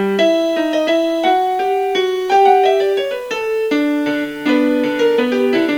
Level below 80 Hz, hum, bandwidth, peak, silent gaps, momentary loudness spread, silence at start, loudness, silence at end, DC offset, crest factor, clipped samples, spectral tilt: -58 dBFS; none; 19 kHz; 0 dBFS; none; 7 LU; 0 s; -15 LUFS; 0 s; under 0.1%; 14 dB; under 0.1%; -4.5 dB/octave